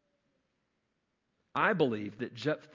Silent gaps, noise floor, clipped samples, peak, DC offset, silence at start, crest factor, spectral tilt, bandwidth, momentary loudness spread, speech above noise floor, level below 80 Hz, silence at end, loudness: none; -81 dBFS; under 0.1%; -12 dBFS; under 0.1%; 1.55 s; 22 dB; -6.5 dB/octave; 7.6 kHz; 11 LU; 49 dB; -76 dBFS; 0.15 s; -32 LUFS